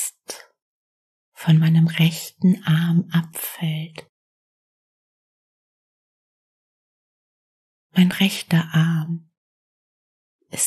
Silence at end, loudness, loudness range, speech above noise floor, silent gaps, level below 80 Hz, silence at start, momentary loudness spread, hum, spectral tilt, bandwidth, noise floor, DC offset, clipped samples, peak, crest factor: 0 s; -20 LUFS; 12 LU; 21 dB; 0.62-1.32 s, 4.09-7.90 s, 9.37-10.39 s; -66 dBFS; 0 s; 16 LU; none; -5 dB/octave; 13 kHz; -40 dBFS; under 0.1%; under 0.1%; -4 dBFS; 20 dB